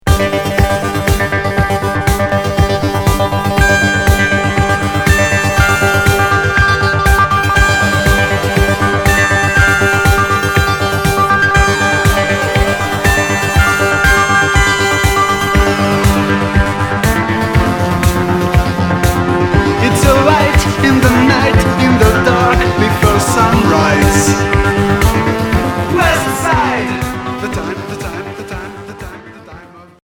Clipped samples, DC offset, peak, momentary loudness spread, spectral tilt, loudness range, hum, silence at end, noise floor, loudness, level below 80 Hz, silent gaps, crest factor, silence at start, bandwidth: under 0.1%; under 0.1%; 0 dBFS; 5 LU; -5 dB/octave; 3 LU; none; 0.2 s; -35 dBFS; -11 LUFS; -22 dBFS; none; 12 dB; 0.05 s; 19.5 kHz